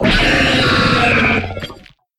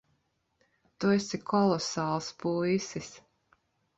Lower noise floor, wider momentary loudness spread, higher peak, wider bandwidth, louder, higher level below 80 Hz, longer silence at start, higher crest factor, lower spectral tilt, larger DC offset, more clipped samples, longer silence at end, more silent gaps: second, -39 dBFS vs -75 dBFS; first, 15 LU vs 10 LU; first, 0 dBFS vs -14 dBFS; first, 13.5 kHz vs 8 kHz; first, -12 LUFS vs -30 LUFS; first, -28 dBFS vs -68 dBFS; second, 0 s vs 1 s; about the same, 14 dB vs 18 dB; about the same, -5 dB/octave vs -5.5 dB/octave; neither; neither; second, 0.45 s vs 0.8 s; neither